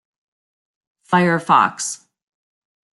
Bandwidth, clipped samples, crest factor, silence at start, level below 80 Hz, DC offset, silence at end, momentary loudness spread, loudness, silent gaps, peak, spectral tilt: 12 kHz; under 0.1%; 20 dB; 1.1 s; -68 dBFS; under 0.1%; 1.05 s; 11 LU; -17 LUFS; none; -2 dBFS; -4.5 dB/octave